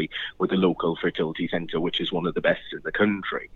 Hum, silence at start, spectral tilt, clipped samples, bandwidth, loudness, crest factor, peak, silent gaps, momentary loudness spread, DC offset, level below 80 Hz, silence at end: none; 0 s; -7.5 dB/octave; under 0.1%; 6.8 kHz; -25 LUFS; 18 dB; -8 dBFS; none; 6 LU; under 0.1%; -54 dBFS; 0 s